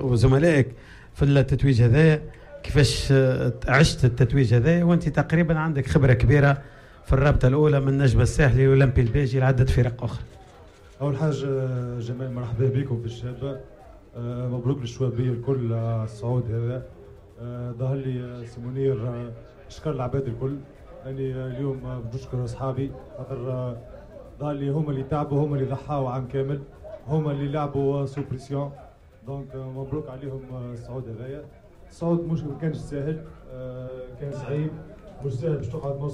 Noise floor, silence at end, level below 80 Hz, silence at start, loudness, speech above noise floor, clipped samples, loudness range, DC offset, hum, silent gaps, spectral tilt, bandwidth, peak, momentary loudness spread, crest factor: -48 dBFS; 0 s; -38 dBFS; 0 s; -24 LUFS; 25 dB; under 0.1%; 11 LU; under 0.1%; none; none; -7.5 dB/octave; 11.5 kHz; -8 dBFS; 17 LU; 16 dB